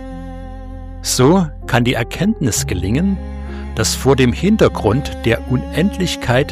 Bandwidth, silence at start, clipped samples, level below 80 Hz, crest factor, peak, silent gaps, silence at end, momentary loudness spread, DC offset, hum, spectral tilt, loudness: 15.5 kHz; 0 s; under 0.1%; -28 dBFS; 16 dB; 0 dBFS; none; 0 s; 17 LU; under 0.1%; none; -5 dB/octave; -16 LUFS